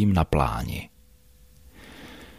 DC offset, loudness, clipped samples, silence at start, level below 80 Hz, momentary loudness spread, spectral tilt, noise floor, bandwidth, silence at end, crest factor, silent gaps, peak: under 0.1%; -26 LUFS; under 0.1%; 0 s; -38 dBFS; 23 LU; -7 dB/octave; -56 dBFS; 15.5 kHz; 0.15 s; 20 dB; none; -6 dBFS